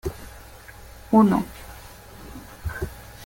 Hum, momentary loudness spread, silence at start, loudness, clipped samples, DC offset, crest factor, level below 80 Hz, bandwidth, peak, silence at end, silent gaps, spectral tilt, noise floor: none; 26 LU; 0.05 s; -23 LUFS; under 0.1%; under 0.1%; 20 dB; -42 dBFS; 17 kHz; -6 dBFS; 0 s; none; -7 dB/octave; -44 dBFS